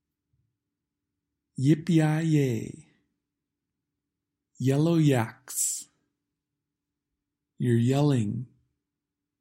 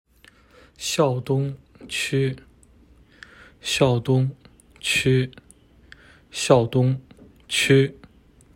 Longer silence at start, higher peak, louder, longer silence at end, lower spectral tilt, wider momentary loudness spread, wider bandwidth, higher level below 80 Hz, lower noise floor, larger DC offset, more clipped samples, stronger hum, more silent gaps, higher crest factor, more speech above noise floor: first, 1.6 s vs 0.8 s; second, -10 dBFS vs -2 dBFS; second, -26 LUFS vs -22 LUFS; first, 0.95 s vs 0.65 s; about the same, -6 dB/octave vs -5 dB/octave; about the same, 12 LU vs 13 LU; about the same, 16 kHz vs 16.5 kHz; second, -68 dBFS vs -54 dBFS; first, -87 dBFS vs -54 dBFS; neither; neither; neither; neither; about the same, 18 dB vs 22 dB; first, 63 dB vs 33 dB